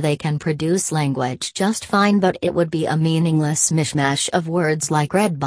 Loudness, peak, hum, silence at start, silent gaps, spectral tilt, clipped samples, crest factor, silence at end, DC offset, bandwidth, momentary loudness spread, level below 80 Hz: -19 LUFS; -2 dBFS; none; 0 s; none; -5 dB/octave; under 0.1%; 16 dB; 0 s; under 0.1%; 11 kHz; 5 LU; -56 dBFS